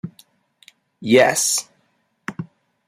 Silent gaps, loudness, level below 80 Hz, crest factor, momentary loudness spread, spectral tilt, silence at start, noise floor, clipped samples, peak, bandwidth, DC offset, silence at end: none; -16 LUFS; -66 dBFS; 20 dB; 22 LU; -3 dB/octave; 0.05 s; -66 dBFS; under 0.1%; -2 dBFS; 16 kHz; under 0.1%; 0.45 s